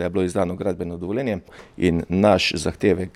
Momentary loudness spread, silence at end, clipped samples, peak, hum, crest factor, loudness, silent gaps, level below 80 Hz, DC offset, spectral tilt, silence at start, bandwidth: 10 LU; 0.05 s; under 0.1%; -2 dBFS; none; 20 dB; -22 LUFS; none; -46 dBFS; under 0.1%; -5.5 dB/octave; 0 s; 13.5 kHz